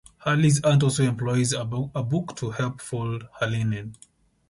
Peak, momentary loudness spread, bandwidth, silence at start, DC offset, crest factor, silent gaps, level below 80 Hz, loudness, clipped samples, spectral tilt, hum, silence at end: -10 dBFS; 11 LU; 11.5 kHz; 0.2 s; under 0.1%; 16 dB; none; -54 dBFS; -25 LUFS; under 0.1%; -5.5 dB/octave; none; 0.55 s